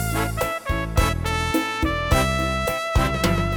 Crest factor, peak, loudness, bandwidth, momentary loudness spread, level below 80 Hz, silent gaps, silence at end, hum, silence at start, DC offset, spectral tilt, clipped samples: 18 dB; -4 dBFS; -22 LUFS; 19 kHz; 4 LU; -28 dBFS; none; 0 s; none; 0 s; under 0.1%; -5 dB/octave; under 0.1%